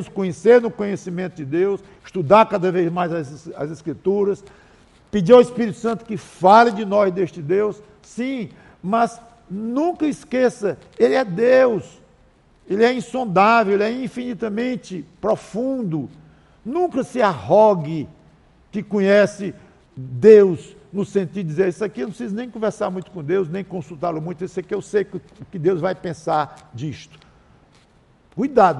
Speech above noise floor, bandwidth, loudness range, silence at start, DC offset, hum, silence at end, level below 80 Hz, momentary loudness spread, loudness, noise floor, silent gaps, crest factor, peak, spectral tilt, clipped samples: 36 dB; 11.5 kHz; 8 LU; 0 s; under 0.1%; none; 0 s; -56 dBFS; 17 LU; -19 LUFS; -55 dBFS; none; 20 dB; 0 dBFS; -6.5 dB/octave; under 0.1%